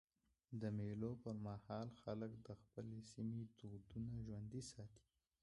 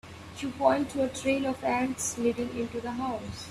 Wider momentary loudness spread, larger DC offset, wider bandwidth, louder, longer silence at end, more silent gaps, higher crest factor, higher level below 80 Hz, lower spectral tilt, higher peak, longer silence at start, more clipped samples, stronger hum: about the same, 10 LU vs 11 LU; neither; second, 11 kHz vs 15 kHz; second, -51 LUFS vs -30 LUFS; first, 0.45 s vs 0 s; neither; about the same, 18 dB vs 20 dB; second, -70 dBFS vs -58 dBFS; first, -7.5 dB/octave vs -4 dB/octave; second, -34 dBFS vs -10 dBFS; first, 0.5 s vs 0.05 s; neither; neither